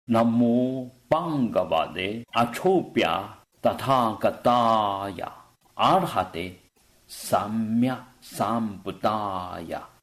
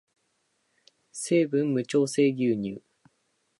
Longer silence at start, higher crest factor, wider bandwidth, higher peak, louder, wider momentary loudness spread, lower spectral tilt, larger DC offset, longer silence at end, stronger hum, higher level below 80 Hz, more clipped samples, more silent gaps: second, 0.1 s vs 1.15 s; about the same, 16 dB vs 18 dB; first, 14 kHz vs 11.5 kHz; about the same, -10 dBFS vs -10 dBFS; about the same, -25 LUFS vs -26 LUFS; about the same, 15 LU vs 14 LU; about the same, -6 dB/octave vs -5.5 dB/octave; neither; second, 0.15 s vs 0.8 s; neither; first, -60 dBFS vs -72 dBFS; neither; neither